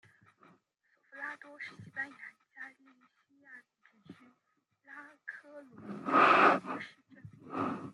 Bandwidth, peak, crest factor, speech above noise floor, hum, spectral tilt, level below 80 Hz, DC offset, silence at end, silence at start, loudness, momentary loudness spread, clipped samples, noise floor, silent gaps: 11.5 kHz; -10 dBFS; 24 dB; 45 dB; none; -5.5 dB/octave; -84 dBFS; under 0.1%; 0 s; 1.15 s; -30 LUFS; 27 LU; under 0.1%; -79 dBFS; none